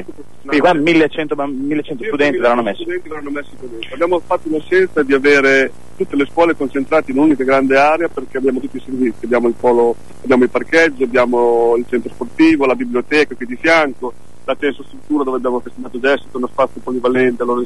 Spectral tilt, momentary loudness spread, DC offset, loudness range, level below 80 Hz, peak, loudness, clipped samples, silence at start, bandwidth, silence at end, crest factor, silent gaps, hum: -5.5 dB/octave; 13 LU; 4%; 4 LU; -50 dBFS; -2 dBFS; -15 LUFS; under 0.1%; 0 s; 11.5 kHz; 0 s; 12 dB; none; none